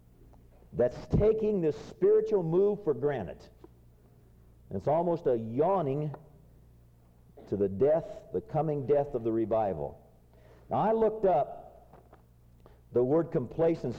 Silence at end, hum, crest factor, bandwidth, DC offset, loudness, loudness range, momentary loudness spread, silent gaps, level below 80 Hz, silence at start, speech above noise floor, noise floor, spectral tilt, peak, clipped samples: 0 s; none; 14 dB; 7.2 kHz; under 0.1%; -29 LUFS; 4 LU; 11 LU; none; -52 dBFS; 0.7 s; 30 dB; -59 dBFS; -9.5 dB/octave; -16 dBFS; under 0.1%